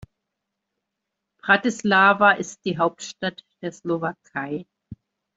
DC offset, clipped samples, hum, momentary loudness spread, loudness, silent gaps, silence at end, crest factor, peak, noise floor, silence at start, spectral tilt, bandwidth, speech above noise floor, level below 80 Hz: under 0.1%; under 0.1%; none; 17 LU; -21 LUFS; none; 0.45 s; 22 dB; -2 dBFS; -82 dBFS; 1.45 s; -4.5 dB/octave; 8 kHz; 60 dB; -64 dBFS